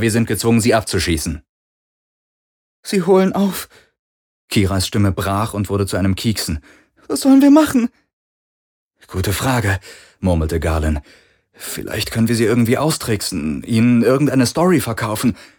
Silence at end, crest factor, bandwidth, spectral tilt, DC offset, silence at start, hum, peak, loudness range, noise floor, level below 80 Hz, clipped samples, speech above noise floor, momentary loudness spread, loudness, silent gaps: 0.15 s; 18 dB; over 20 kHz; -5.5 dB/octave; under 0.1%; 0 s; none; 0 dBFS; 5 LU; under -90 dBFS; -34 dBFS; under 0.1%; over 74 dB; 11 LU; -17 LUFS; 1.49-2.83 s, 3.99-4.48 s, 8.13-8.91 s